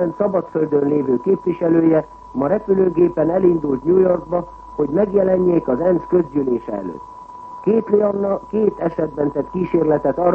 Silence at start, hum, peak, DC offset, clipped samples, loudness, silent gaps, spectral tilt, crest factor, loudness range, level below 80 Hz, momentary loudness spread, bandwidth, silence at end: 0 s; none; -2 dBFS; under 0.1%; under 0.1%; -18 LUFS; none; -11 dB/octave; 16 dB; 3 LU; -48 dBFS; 9 LU; 3.2 kHz; 0 s